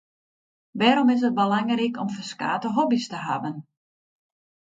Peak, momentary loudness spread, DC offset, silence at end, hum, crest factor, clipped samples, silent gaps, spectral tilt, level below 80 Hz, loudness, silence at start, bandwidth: -4 dBFS; 11 LU; under 0.1%; 1.05 s; none; 22 dB; under 0.1%; none; -5.5 dB/octave; -74 dBFS; -23 LUFS; 0.75 s; 7.8 kHz